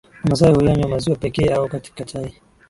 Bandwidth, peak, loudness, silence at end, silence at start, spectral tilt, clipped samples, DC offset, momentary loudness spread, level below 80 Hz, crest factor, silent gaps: 11.5 kHz; 0 dBFS; -18 LUFS; 0.4 s; 0.25 s; -7 dB/octave; under 0.1%; under 0.1%; 16 LU; -38 dBFS; 18 dB; none